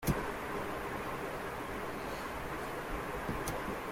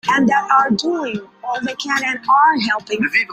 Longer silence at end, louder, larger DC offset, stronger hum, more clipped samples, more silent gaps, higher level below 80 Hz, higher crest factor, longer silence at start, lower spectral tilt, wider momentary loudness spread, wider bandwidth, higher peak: about the same, 0 s vs 0 s; second, -39 LUFS vs -16 LUFS; neither; neither; neither; neither; first, -50 dBFS vs -60 dBFS; about the same, 20 dB vs 16 dB; about the same, 0 s vs 0.05 s; about the same, -5 dB/octave vs -4 dB/octave; second, 3 LU vs 11 LU; about the same, 16.5 kHz vs 15.5 kHz; second, -18 dBFS vs -2 dBFS